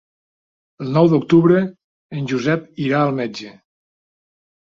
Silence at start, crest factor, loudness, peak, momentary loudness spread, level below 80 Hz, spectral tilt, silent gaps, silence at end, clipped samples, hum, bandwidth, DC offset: 0.8 s; 18 dB; -18 LUFS; -2 dBFS; 18 LU; -58 dBFS; -8 dB/octave; 1.84-2.10 s; 1.2 s; under 0.1%; none; 7.4 kHz; under 0.1%